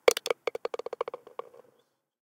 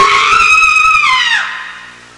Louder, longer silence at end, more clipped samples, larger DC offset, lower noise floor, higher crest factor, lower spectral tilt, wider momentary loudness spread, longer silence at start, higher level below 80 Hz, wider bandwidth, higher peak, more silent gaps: second, -33 LUFS vs -7 LUFS; first, 1.05 s vs 0.25 s; neither; neither; first, -71 dBFS vs -32 dBFS; first, 30 dB vs 10 dB; about the same, -0.5 dB/octave vs 0.5 dB/octave; about the same, 16 LU vs 16 LU; about the same, 0.05 s vs 0 s; second, -78 dBFS vs -40 dBFS; first, 18 kHz vs 11.5 kHz; about the same, -2 dBFS vs -2 dBFS; neither